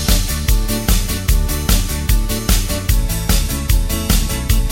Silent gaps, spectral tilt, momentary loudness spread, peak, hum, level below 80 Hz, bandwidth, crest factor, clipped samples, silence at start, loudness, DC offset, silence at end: none; -4 dB/octave; 1 LU; 0 dBFS; none; -16 dBFS; 17 kHz; 14 dB; under 0.1%; 0 s; -17 LUFS; under 0.1%; 0 s